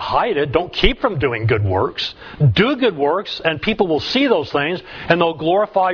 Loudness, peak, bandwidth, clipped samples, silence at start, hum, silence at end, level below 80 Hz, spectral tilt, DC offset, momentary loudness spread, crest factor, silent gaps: -18 LUFS; 0 dBFS; 5.4 kHz; under 0.1%; 0 s; none; 0 s; -34 dBFS; -7 dB/octave; under 0.1%; 5 LU; 18 dB; none